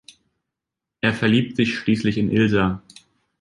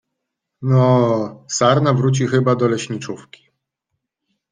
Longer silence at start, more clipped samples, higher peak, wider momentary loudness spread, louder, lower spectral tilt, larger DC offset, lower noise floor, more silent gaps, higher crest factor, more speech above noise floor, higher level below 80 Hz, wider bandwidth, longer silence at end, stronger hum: first, 1.05 s vs 0.6 s; neither; about the same, -4 dBFS vs -2 dBFS; second, 6 LU vs 13 LU; second, -20 LUFS vs -17 LUFS; about the same, -6.5 dB/octave vs -6 dB/octave; neither; first, -85 dBFS vs -78 dBFS; neither; about the same, 18 dB vs 16 dB; first, 66 dB vs 62 dB; first, -48 dBFS vs -58 dBFS; first, 11 kHz vs 9.4 kHz; second, 0.6 s vs 1.35 s; neither